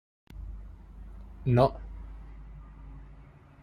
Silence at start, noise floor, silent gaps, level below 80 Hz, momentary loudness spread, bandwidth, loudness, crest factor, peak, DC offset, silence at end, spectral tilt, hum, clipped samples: 0.3 s; -52 dBFS; none; -44 dBFS; 25 LU; 9.8 kHz; -27 LUFS; 24 dB; -8 dBFS; under 0.1%; 0.3 s; -9 dB/octave; none; under 0.1%